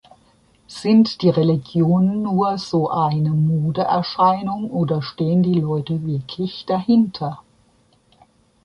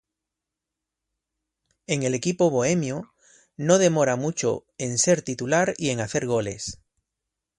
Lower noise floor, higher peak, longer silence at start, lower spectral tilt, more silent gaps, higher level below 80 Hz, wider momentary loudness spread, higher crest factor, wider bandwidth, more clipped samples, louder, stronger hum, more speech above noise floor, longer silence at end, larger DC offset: second, -58 dBFS vs -86 dBFS; about the same, -4 dBFS vs -4 dBFS; second, 0.7 s vs 1.9 s; first, -8.5 dB/octave vs -4.5 dB/octave; neither; about the same, -56 dBFS vs -60 dBFS; about the same, 9 LU vs 11 LU; second, 16 dB vs 22 dB; about the same, 10.5 kHz vs 11.5 kHz; neither; first, -19 LUFS vs -23 LUFS; neither; second, 40 dB vs 63 dB; first, 1.25 s vs 0.85 s; neither